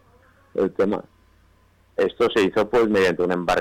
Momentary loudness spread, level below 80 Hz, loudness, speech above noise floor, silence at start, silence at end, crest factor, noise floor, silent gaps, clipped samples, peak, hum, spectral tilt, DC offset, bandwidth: 9 LU; -52 dBFS; -21 LUFS; 37 dB; 0.55 s; 0 s; 10 dB; -57 dBFS; none; under 0.1%; -12 dBFS; none; -5.5 dB/octave; under 0.1%; 15 kHz